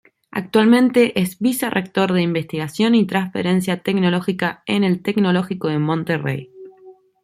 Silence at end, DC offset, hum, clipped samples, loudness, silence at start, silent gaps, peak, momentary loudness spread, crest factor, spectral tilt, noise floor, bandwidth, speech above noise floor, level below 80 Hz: 0.3 s; under 0.1%; none; under 0.1%; -19 LUFS; 0.35 s; none; -4 dBFS; 8 LU; 16 dB; -6 dB/octave; -46 dBFS; 15.5 kHz; 28 dB; -60 dBFS